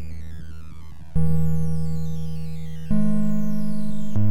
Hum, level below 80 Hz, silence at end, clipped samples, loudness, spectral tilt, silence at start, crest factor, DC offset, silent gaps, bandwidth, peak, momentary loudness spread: none; -38 dBFS; 0 s; under 0.1%; -26 LUFS; -9 dB/octave; 0 s; 12 dB; 10%; none; 16 kHz; -8 dBFS; 17 LU